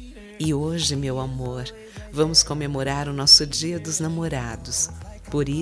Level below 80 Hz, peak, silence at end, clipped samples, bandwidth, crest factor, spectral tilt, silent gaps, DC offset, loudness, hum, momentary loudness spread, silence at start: -42 dBFS; 0 dBFS; 0 s; under 0.1%; 11 kHz; 22 dB; -3 dB/octave; none; under 0.1%; -21 LUFS; none; 18 LU; 0 s